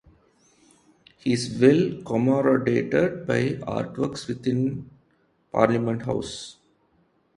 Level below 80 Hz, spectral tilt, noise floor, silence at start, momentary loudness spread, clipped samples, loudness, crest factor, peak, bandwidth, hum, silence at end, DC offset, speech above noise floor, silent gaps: -56 dBFS; -6.5 dB/octave; -65 dBFS; 1.25 s; 11 LU; under 0.1%; -24 LUFS; 22 dB; -2 dBFS; 11.5 kHz; none; 0.85 s; under 0.1%; 42 dB; none